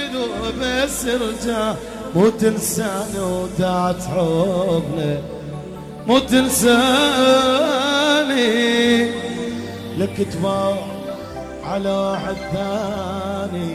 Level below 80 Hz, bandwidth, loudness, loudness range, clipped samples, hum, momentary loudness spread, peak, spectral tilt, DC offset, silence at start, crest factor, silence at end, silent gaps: -42 dBFS; 15.5 kHz; -19 LUFS; 8 LU; under 0.1%; none; 14 LU; -4 dBFS; -4 dB/octave; under 0.1%; 0 s; 16 dB; 0 s; none